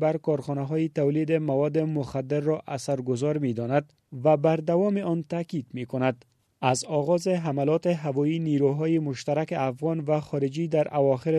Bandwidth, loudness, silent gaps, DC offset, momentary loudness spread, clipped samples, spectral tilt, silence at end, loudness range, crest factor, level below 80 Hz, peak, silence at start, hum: 11.5 kHz; -26 LUFS; none; under 0.1%; 6 LU; under 0.1%; -7 dB/octave; 0 s; 1 LU; 18 dB; -66 dBFS; -8 dBFS; 0 s; none